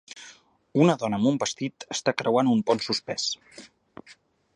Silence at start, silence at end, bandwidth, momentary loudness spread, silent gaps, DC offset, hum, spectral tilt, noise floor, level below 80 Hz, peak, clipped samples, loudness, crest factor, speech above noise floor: 0.15 s; 0.45 s; 10.5 kHz; 11 LU; none; under 0.1%; none; -5 dB/octave; -52 dBFS; -68 dBFS; -6 dBFS; under 0.1%; -25 LUFS; 20 dB; 27 dB